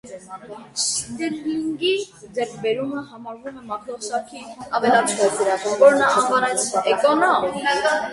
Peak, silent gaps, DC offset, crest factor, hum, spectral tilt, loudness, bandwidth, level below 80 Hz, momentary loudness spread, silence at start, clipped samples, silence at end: -2 dBFS; none; under 0.1%; 18 dB; none; -2.5 dB/octave; -20 LUFS; 11.5 kHz; -62 dBFS; 19 LU; 0.05 s; under 0.1%; 0 s